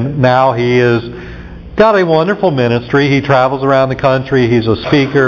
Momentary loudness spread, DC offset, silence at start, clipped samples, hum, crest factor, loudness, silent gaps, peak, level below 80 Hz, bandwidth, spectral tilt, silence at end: 9 LU; under 0.1%; 0 s; under 0.1%; none; 12 dB; -11 LUFS; none; 0 dBFS; -36 dBFS; 7 kHz; -7.5 dB/octave; 0 s